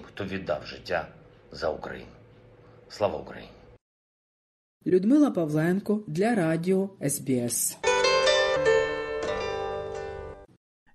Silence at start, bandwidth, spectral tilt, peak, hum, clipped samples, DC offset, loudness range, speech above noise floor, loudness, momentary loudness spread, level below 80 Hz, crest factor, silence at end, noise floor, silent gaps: 0 s; 12.5 kHz; -4.5 dB/octave; -8 dBFS; none; under 0.1%; under 0.1%; 12 LU; 26 dB; -26 LUFS; 17 LU; -56 dBFS; 18 dB; 0.5 s; -53 dBFS; 3.81-4.81 s